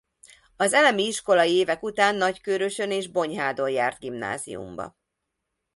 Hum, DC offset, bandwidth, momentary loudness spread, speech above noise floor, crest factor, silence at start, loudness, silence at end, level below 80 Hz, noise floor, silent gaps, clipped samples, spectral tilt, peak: none; under 0.1%; 11.5 kHz; 15 LU; 57 dB; 20 dB; 0.6 s; -23 LUFS; 0.85 s; -64 dBFS; -81 dBFS; none; under 0.1%; -3 dB/octave; -6 dBFS